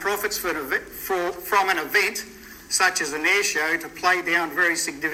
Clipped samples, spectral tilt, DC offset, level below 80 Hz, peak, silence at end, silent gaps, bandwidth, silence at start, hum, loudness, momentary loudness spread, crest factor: under 0.1%; -1 dB/octave; under 0.1%; -56 dBFS; -6 dBFS; 0 s; none; 16.5 kHz; 0 s; none; -22 LUFS; 7 LU; 18 dB